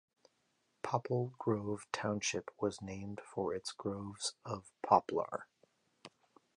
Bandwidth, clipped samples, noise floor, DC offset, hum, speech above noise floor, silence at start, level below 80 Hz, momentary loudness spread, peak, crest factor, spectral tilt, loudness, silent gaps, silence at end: 11 kHz; under 0.1%; -79 dBFS; under 0.1%; none; 41 dB; 0.85 s; -70 dBFS; 14 LU; -12 dBFS; 26 dB; -4.5 dB/octave; -38 LUFS; none; 0.5 s